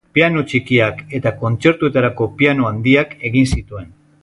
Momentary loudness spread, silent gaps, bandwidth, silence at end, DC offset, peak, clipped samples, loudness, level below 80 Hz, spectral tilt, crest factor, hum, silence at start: 7 LU; none; 11.5 kHz; 0.35 s; under 0.1%; 0 dBFS; under 0.1%; -16 LUFS; -36 dBFS; -6.5 dB/octave; 16 dB; none; 0.15 s